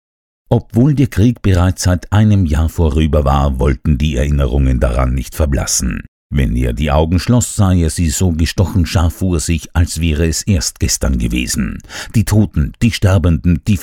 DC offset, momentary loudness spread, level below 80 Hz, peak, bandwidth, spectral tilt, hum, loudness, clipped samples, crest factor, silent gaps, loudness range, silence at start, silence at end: under 0.1%; 5 LU; -20 dBFS; 0 dBFS; 17 kHz; -5.5 dB/octave; none; -14 LUFS; under 0.1%; 14 dB; 6.08-6.30 s; 2 LU; 0.5 s; 0 s